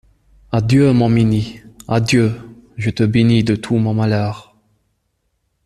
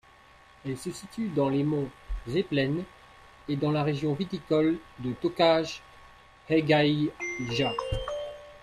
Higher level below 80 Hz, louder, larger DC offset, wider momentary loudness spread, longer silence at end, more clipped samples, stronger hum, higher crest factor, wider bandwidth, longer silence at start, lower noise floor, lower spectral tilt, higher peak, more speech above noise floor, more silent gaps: about the same, -44 dBFS vs -48 dBFS; first, -16 LUFS vs -28 LUFS; neither; about the same, 15 LU vs 14 LU; first, 1.25 s vs 0.05 s; neither; neither; about the same, 16 dB vs 18 dB; second, 12 kHz vs 13.5 kHz; second, 0.5 s vs 0.65 s; first, -68 dBFS vs -55 dBFS; about the same, -7 dB/octave vs -6.5 dB/octave; first, -2 dBFS vs -10 dBFS; first, 54 dB vs 28 dB; neither